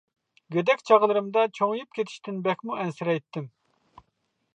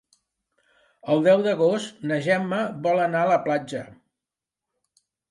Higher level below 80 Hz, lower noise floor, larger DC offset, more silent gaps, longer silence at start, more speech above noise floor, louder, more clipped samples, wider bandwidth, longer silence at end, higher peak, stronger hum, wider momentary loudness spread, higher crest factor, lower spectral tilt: about the same, -76 dBFS vs -72 dBFS; second, -75 dBFS vs -88 dBFS; neither; neither; second, 0.5 s vs 1.05 s; second, 50 dB vs 66 dB; second, -25 LUFS vs -22 LUFS; neither; second, 8.8 kHz vs 11.5 kHz; second, 1.05 s vs 1.4 s; about the same, -6 dBFS vs -8 dBFS; neither; first, 13 LU vs 9 LU; about the same, 20 dB vs 18 dB; about the same, -6 dB/octave vs -6 dB/octave